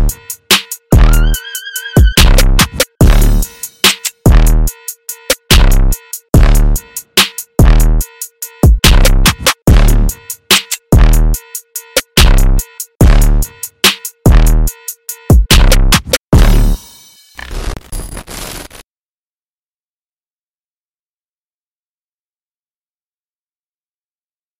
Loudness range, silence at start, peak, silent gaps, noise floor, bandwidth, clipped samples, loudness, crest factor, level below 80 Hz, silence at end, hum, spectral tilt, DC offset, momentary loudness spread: 7 LU; 0 s; 0 dBFS; 12.95-13.00 s, 16.21-16.31 s; under -90 dBFS; 17 kHz; 0.1%; -11 LUFS; 10 dB; -12 dBFS; 5.95 s; none; -4 dB/octave; under 0.1%; 16 LU